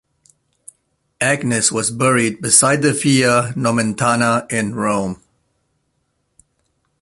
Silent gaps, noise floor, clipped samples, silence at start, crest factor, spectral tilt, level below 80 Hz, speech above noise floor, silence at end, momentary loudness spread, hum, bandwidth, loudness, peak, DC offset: none; -68 dBFS; under 0.1%; 1.2 s; 18 dB; -3.5 dB/octave; -54 dBFS; 52 dB; 1.85 s; 8 LU; none; 12 kHz; -16 LUFS; 0 dBFS; under 0.1%